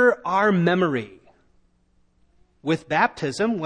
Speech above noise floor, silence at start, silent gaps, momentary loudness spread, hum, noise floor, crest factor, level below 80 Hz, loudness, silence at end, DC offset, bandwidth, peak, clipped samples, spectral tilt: 41 dB; 0 s; none; 11 LU; none; -63 dBFS; 18 dB; -62 dBFS; -22 LUFS; 0 s; under 0.1%; 10 kHz; -6 dBFS; under 0.1%; -6.5 dB/octave